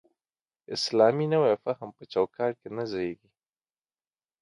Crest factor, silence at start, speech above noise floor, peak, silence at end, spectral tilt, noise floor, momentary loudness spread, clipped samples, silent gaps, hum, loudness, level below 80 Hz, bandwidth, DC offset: 20 dB; 0.7 s; over 63 dB; -8 dBFS; 1.25 s; -5.5 dB/octave; under -90 dBFS; 13 LU; under 0.1%; none; none; -27 LUFS; -70 dBFS; 11.5 kHz; under 0.1%